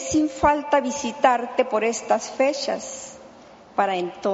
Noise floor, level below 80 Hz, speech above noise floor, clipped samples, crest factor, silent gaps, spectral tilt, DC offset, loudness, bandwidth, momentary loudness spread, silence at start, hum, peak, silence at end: -47 dBFS; -52 dBFS; 25 dB; under 0.1%; 20 dB; none; -3 dB/octave; under 0.1%; -22 LUFS; 8 kHz; 10 LU; 0 s; none; -2 dBFS; 0 s